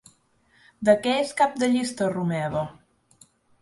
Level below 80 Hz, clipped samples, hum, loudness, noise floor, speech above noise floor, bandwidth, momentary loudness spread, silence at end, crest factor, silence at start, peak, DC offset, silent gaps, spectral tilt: -60 dBFS; under 0.1%; none; -24 LUFS; -63 dBFS; 40 dB; 11.5 kHz; 8 LU; 0.9 s; 20 dB; 0.8 s; -6 dBFS; under 0.1%; none; -5.5 dB/octave